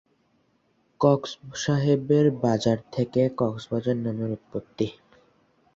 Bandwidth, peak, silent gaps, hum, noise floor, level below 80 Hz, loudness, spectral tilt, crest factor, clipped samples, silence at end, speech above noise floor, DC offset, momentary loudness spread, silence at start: 7.8 kHz; -6 dBFS; none; none; -67 dBFS; -60 dBFS; -25 LUFS; -7 dB/octave; 20 dB; under 0.1%; 0.85 s; 43 dB; under 0.1%; 10 LU; 1 s